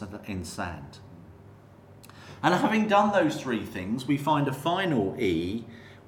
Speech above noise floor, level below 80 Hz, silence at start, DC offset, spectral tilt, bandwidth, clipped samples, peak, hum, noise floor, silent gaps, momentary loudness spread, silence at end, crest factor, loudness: 24 dB; -58 dBFS; 0 s; under 0.1%; -6 dB/octave; 17.5 kHz; under 0.1%; -8 dBFS; none; -51 dBFS; none; 21 LU; 0.1 s; 20 dB; -27 LUFS